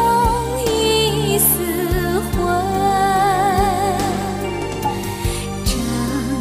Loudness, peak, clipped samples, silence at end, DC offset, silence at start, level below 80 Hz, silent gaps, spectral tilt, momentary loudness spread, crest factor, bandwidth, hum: -18 LUFS; -2 dBFS; under 0.1%; 0 s; under 0.1%; 0 s; -30 dBFS; none; -4 dB/octave; 8 LU; 16 dB; 15.5 kHz; none